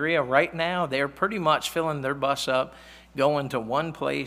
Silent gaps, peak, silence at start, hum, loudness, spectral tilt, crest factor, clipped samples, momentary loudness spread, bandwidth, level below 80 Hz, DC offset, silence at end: none; -4 dBFS; 0 s; none; -25 LUFS; -4.5 dB/octave; 20 dB; under 0.1%; 5 LU; 16 kHz; -58 dBFS; under 0.1%; 0 s